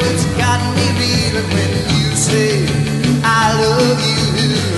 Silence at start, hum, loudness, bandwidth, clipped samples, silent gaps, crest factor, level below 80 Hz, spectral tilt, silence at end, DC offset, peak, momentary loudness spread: 0 s; none; -14 LUFS; 12 kHz; under 0.1%; none; 12 dB; -34 dBFS; -4.5 dB/octave; 0 s; under 0.1%; -2 dBFS; 3 LU